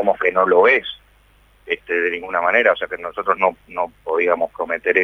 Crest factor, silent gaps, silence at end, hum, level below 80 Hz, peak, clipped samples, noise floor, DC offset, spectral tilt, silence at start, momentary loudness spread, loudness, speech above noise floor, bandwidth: 18 dB; none; 0 s; none; -56 dBFS; 0 dBFS; under 0.1%; -53 dBFS; under 0.1%; -5.5 dB/octave; 0 s; 12 LU; -18 LUFS; 35 dB; 6 kHz